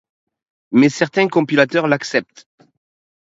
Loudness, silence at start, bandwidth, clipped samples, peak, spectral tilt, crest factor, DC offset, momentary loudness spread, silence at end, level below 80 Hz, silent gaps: -16 LUFS; 0.7 s; 8 kHz; under 0.1%; 0 dBFS; -5.5 dB/octave; 18 dB; under 0.1%; 5 LU; 1.05 s; -66 dBFS; none